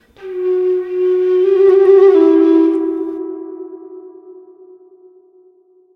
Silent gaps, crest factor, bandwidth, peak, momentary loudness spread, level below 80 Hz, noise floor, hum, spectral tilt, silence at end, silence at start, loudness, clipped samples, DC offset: none; 14 dB; 4.2 kHz; 0 dBFS; 21 LU; -66 dBFS; -50 dBFS; none; -6.5 dB/octave; 1.55 s; 0.2 s; -12 LUFS; under 0.1%; under 0.1%